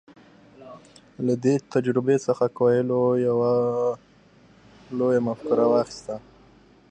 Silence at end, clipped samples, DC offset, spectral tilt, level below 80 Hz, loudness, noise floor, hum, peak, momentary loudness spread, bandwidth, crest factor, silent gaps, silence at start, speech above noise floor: 0.7 s; under 0.1%; under 0.1%; -7.5 dB/octave; -64 dBFS; -23 LUFS; -54 dBFS; none; -8 dBFS; 12 LU; 9 kHz; 16 dB; none; 0.6 s; 32 dB